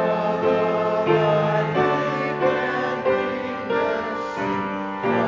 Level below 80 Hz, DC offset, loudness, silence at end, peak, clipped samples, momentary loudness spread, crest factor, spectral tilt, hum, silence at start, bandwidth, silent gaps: -56 dBFS; under 0.1%; -22 LUFS; 0 s; -6 dBFS; under 0.1%; 6 LU; 16 dB; -7 dB/octave; none; 0 s; 7.6 kHz; none